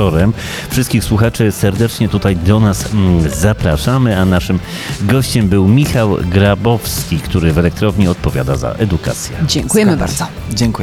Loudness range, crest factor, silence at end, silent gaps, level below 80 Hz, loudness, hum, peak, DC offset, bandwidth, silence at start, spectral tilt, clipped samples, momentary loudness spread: 2 LU; 12 dB; 0 s; none; -26 dBFS; -13 LUFS; none; 0 dBFS; under 0.1%; 16.5 kHz; 0 s; -6 dB/octave; under 0.1%; 6 LU